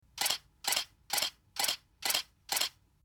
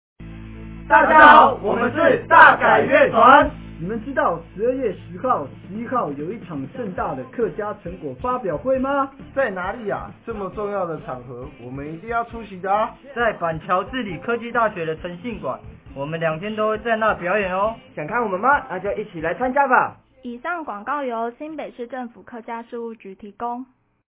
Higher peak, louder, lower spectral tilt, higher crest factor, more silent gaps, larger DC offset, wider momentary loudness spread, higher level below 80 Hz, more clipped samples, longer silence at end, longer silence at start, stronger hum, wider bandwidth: second, -12 dBFS vs 0 dBFS; second, -33 LUFS vs -19 LUFS; second, 1.5 dB/octave vs -9 dB/octave; about the same, 24 dB vs 20 dB; neither; neither; second, 3 LU vs 20 LU; second, -70 dBFS vs -46 dBFS; neither; about the same, 0.35 s vs 0.45 s; about the same, 0.15 s vs 0.2 s; neither; first, over 20 kHz vs 4 kHz